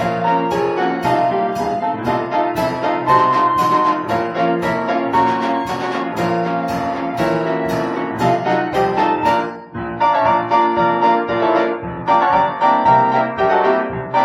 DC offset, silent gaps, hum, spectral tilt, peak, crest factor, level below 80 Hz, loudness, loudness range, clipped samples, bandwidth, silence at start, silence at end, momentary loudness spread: under 0.1%; none; none; -6.5 dB/octave; 0 dBFS; 16 dB; -50 dBFS; -17 LUFS; 4 LU; under 0.1%; 16 kHz; 0 s; 0 s; 6 LU